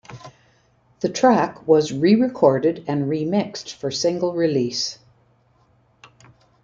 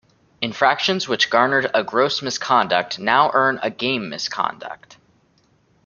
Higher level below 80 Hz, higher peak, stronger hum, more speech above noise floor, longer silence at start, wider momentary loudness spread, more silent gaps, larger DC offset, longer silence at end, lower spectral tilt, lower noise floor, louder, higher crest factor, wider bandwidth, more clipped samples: about the same, -62 dBFS vs -66 dBFS; about the same, -2 dBFS vs -2 dBFS; neither; about the same, 40 dB vs 40 dB; second, 0.1 s vs 0.4 s; about the same, 11 LU vs 10 LU; neither; neither; first, 1.7 s vs 1.1 s; first, -5.5 dB/octave vs -3 dB/octave; about the same, -59 dBFS vs -60 dBFS; about the same, -20 LUFS vs -19 LUFS; about the same, 18 dB vs 20 dB; about the same, 7.8 kHz vs 7.4 kHz; neither